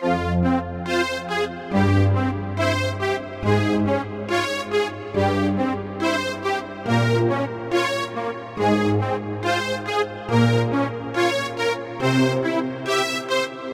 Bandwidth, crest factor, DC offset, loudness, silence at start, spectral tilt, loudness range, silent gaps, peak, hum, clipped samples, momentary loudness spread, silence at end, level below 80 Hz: 15.5 kHz; 16 dB; under 0.1%; -22 LUFS; 0 s; -6 dB/octave; 1 LU; none; -6 dBFS; none; under 0.1%; 6 LU; 0 s; -48 dBFS